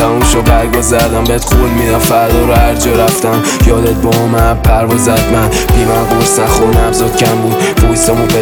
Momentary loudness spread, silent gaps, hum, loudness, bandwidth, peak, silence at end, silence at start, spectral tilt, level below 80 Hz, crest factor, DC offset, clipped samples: 2 LU; none; none; -9 LUFS; over 20 kHz; 0 dBFS; 0 s; 0 s; -5 dB/octave; -16 dBFS; 8 dB; under 0.1%; under 0.1%